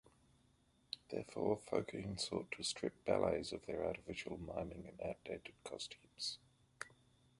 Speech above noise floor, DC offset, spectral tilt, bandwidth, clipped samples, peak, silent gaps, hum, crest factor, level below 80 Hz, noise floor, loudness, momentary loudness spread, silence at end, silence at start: 31 dB; under 0.1%; -4 dB/octave; 11.5 kHz; under 0.1%; -20 dBFS; none; none; 24 dB; -66 dBFS; -74 dBFS; -43 LUFS; 12 LU; 0.5 s; 0.95 s